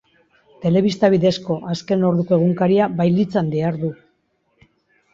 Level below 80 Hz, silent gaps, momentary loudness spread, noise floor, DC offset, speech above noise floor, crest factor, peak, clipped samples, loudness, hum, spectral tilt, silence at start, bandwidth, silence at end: -58 dBFS; none; 8 LU; -66 dBFS; under 0.1%; 48 dB; 16 dB; -2 dBFS; under 0.1%; -18 LUFS; none; -8 dB/octave; 0.6 s; 7.6 kHz; 1.2 s